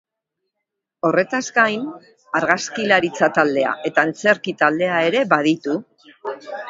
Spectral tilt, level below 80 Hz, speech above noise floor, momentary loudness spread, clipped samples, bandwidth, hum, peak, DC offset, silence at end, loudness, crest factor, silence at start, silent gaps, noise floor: -4.5 dB/octave; -68 dBFS; 61 dB; 11 LU; under 0.1%; 7.8 kHz; none; 0 dBFS; under 0.1%; 0 s; -18 LUFS; 20 dB; 1.05 s; none; -80 dBFS